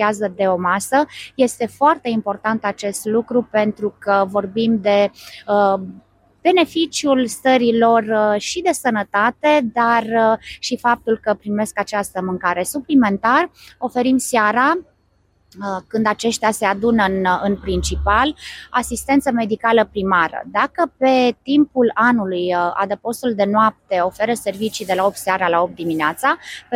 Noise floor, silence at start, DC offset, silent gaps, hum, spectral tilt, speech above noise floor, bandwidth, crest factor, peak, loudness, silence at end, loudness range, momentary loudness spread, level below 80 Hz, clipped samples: -60 dBFS; 0 s; under 0.1%; none; none; -4.5 dB/octave; 42 dB; 16 kHz; 16 dB; -2 dBFS; -18 LUFS; 0 s; 2 LU; 7 LU; -40 dBFS; under 0.1%